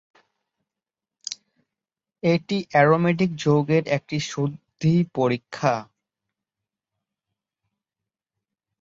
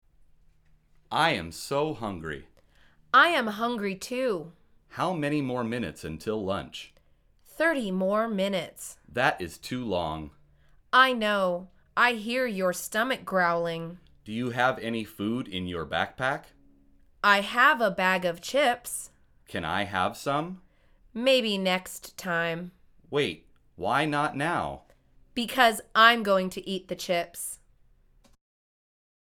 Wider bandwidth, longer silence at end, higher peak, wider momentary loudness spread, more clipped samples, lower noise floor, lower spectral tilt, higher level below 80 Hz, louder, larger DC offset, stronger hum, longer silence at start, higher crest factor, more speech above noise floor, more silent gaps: second, 7.8 kHz vs 19 kHz; first, 3 s vs 1.8 s; about the same, -4 dBFS vs -4 dBFS; about the same, 15 LU vs 16 LU; neither; first, -89 dBFS vs -61 dBFS; first, -6.5 dB/octave vs -4 dB/octave; second, -64 dBFS vs -58 dBFS; first, -22 LUFS vs -27 LUFS; neither; neither; first, 1.3 s vs 1.1 s; about the same, 22 dB vs 24 dB; first, 68 dB vs 35 dB; neither